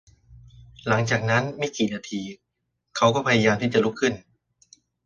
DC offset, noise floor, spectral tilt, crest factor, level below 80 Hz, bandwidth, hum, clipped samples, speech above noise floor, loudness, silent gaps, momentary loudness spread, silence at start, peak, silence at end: under 0.1%; -78 dBFS; -5 dB/octave; 20 dB; -58 dBFS; 9.8 kHz; none; under 0.1%; 55 dB; -23 LUFS; none; 15 LU; 0.3 s; -6 dBFS; 0.85 s